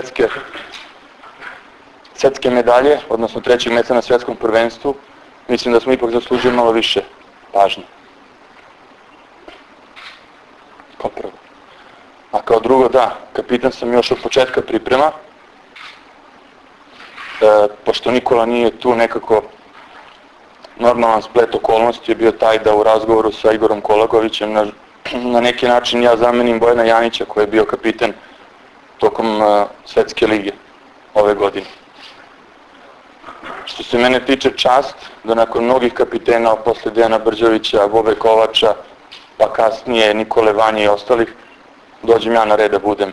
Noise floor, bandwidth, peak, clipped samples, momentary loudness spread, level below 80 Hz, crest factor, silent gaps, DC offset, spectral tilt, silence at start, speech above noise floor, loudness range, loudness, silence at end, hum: -44 dBFS; 11 kHz; 0 dBFS; under 0.1%; 14 LU; -48 dBFS; 16 dB; none; under 0.1%; -4.5 dB/octave; 0 s; 30 dB; 6 LU; -14 LUFS; 0 s; none